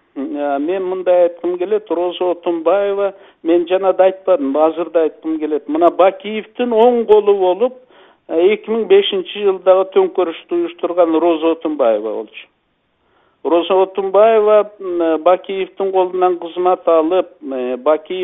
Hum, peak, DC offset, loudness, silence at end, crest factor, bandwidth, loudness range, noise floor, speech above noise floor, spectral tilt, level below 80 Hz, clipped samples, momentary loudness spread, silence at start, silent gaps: none; 0 dBFS; under 0.1%; -15 LUFS; 0 s; 16 dB; 3.9 kHz; 3 LU; -64 dBFS; 49 dB; -8 dB/octave; -62 dBFS; under 0.1%; 9 LU; 0.15 s; none